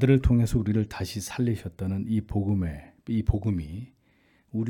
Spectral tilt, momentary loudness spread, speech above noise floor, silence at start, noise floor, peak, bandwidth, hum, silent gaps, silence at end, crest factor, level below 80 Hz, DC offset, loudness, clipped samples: -7.5 dB/octave; 13 LU; 39 dB; 0 s; -64 dBFS; -8 dBFS; 18 kHz; none; none; 0 s; 18 dB; -38 dBFS; under 0.1%; -27 LUFS; under 0.1%